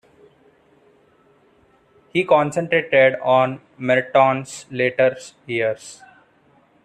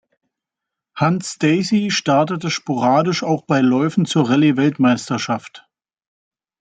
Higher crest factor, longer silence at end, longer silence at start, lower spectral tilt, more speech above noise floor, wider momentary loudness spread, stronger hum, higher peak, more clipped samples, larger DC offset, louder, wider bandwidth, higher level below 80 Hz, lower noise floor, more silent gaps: about the same, 18 dB vs 16 dB; about the same, 0.9 s vs 1 s; first, 2.15 s vs 0.95 s; about the same, -5 dB/octave vs -5.5 dB/octave; second, 38 dB vs 67 dB; first, 13 LU vs 7 LU; neither; about the same, -2 dBFS vs -4 dBFS; neither; neither; about the same, -19 LUFS vs -17 LUFS; first, 11 kHz vs 9.4 kHz; about the same, -66 dBFS vs -62 dBFS; second, -57 dBFS vs -84 dBFS; neither